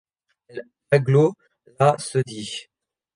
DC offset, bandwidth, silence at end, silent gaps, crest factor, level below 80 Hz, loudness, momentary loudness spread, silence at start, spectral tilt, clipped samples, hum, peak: under 0.1%; 10.5 kHz; 0.55 s; none; 20 dB; -64 dBFS; -21 LUFS; 20 LU; 0.55 s; -6 dB/octave; under 0.1%; none; -4 dBFS